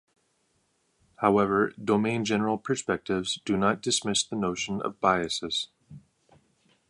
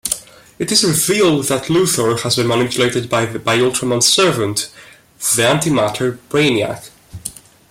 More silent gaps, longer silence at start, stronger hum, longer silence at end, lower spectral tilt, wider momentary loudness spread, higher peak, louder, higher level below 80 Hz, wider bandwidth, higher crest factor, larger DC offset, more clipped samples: neither; first, 1.2 s vs 0.05 s; neither; first, 0.9 s vs 0.4 s; about the same, -4 dB/octave vs -3.5 dB/octave; second, 6 LU vs 11 LU; second, -6 dBFS vs 0 dBFS; second, -27 LUFS vs -15 LUFS; second, -60 dBFS vs -52 dBFS; second, 11.5 kHz vs 16.5 kHz; first, 22 dB vs 16 dB; neither; neither